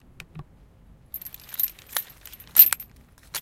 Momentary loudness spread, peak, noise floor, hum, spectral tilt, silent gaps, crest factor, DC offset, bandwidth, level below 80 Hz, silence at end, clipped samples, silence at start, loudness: 23 LU; 0 dBFS; -53 dBFS; none; 0 dB/octave; none; 26 dB; under 0.1%; 17 kHz; -56 dBFS; 0 s; under 0.1%; 0.35 s; -19 LUFS